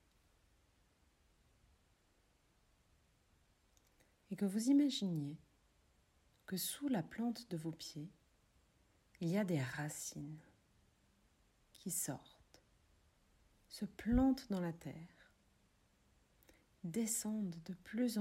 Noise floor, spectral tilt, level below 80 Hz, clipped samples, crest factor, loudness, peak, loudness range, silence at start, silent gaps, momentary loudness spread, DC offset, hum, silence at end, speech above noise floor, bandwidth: -75 dBFS; -5 dB/octave; -62 dBFS; under 0.1%; 20 dB; -40 LUFS; -22 dBFS; 8 LU; 4.3 s; none; 18 LU; under 0.1%; none; 0 s; 36 dB; 16 kHz